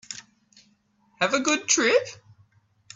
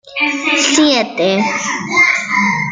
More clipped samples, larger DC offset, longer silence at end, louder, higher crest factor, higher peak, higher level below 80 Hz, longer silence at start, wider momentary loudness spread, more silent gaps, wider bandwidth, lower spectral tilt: neither; neither; first, 0.8 s vs 0 s; second, -22 LUFS vs -13 LUFS; first, 22 dB vs 14 dB; second, -6 dBFS vs 0 dBFS; second, -72 dBFS vs -58 dBFS; about the same, 0.1 s vs 0.05 s; first, 20 LU vs 6 LU; neither; second, 8 kHz vs 9.6 kHz; about the same, -1.5 dB/octave vs -2.5 dB/octave